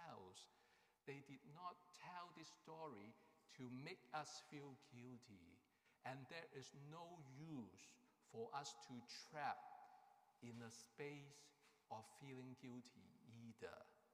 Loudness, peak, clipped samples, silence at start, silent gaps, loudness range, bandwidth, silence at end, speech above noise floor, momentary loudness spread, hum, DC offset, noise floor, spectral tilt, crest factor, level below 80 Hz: -58 LUFS; -36 dBFS; under 0.1%; 0 s; none; 4 LU; 15 kHz; 0 s; 22 dB; 12 LU; none; under 0.1%; -79 dBFS; -4.5 dB/octave; 24 dB; under -90 dBFS